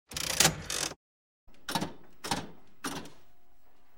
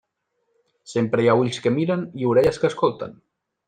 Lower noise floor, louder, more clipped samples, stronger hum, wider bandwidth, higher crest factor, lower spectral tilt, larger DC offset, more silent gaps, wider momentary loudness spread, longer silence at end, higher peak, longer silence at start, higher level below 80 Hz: second, -66 dBFS vs -73 dBFS; second, -31 LUFS vs -21 LUFS; neither; neither; first, 16.5 kHz vs 9.8 kHz; first, 30 dB vs 18 dB; second, -1.5 dB/octave vs -6.5 dB/octave; neither; first, 0.96-1.47 s vs none; first, 22 LU vs 9 LU; first, 0.8 s vs 0.55 s; about the same, -6 dBFS vs -4 dBFS; second, 0.05 s vs 0.9 s; about the same, -56 dBFS vs -54 dBFS